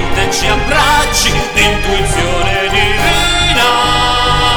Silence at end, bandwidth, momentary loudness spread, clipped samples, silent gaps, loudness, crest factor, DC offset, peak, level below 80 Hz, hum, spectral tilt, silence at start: 0 s; over 20 kHz; 4 LU; under 0.1%; none; -11 LUFS; 12 dB; under 0.1%; 0 dBFS; -20 dBFS; none; -3 dB/octave; 0 s